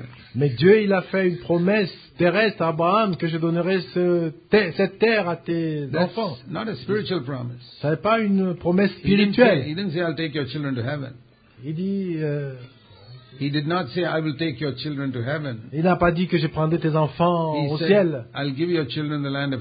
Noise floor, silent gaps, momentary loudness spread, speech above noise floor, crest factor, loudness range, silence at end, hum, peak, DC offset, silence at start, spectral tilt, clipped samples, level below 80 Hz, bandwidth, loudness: -45 dBFS; none; 10 LU; 24 dB; 20 dB; 6 LU; 0 s; none; -2 dBFS; under 0.1%; 0 s; -11.5 dB/octave; under 0.1%; -52 dBFS; 5 kHz; -22 LUFS